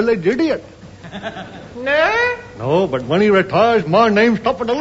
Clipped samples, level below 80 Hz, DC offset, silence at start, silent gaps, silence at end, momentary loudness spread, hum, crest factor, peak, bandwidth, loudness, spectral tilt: under 0.1%; -48 dBFS; under 0.1%; 0 s; none; 0 s; 16 LU; none; 14 dB; -2 dBFS; 8 kHz; -16 LUFS; -6.5 dB/octave